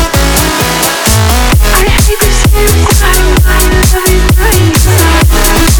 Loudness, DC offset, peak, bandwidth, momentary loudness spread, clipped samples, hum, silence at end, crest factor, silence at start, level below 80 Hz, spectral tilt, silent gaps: -7 LUFS; under 0.1%; 0 dBFS; over 20 kHz; 2 LU; 0.2%; none; 0 s; 6 dB; 0 s; -10 dBFS; -4 dB/octave; none